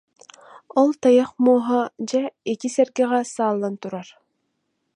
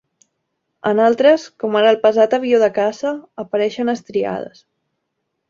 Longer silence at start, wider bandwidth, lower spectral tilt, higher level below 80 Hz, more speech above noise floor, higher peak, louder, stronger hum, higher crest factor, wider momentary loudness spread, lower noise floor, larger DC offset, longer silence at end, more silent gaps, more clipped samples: second, 0.55 s vs 0.85 s; first, 10.5 kHz vs 7.4 kHz; about the same, -5 dB/octave vs -5 dB/octave; second, -74 dBFS vs -64 dBFS; second, 54 dB vs 58 dB; about the same, -4 dBFS vs -2 dBFS; second, -21 LUFS vs -16 LUFS; neither; about the same, 18 dB vs 16 dB; about the same, 11 LU vs 11 LU; about the same, -74 dBFS vs -74 dBFS; neither; about the same, 0.9 s vs 1 s; neither; neither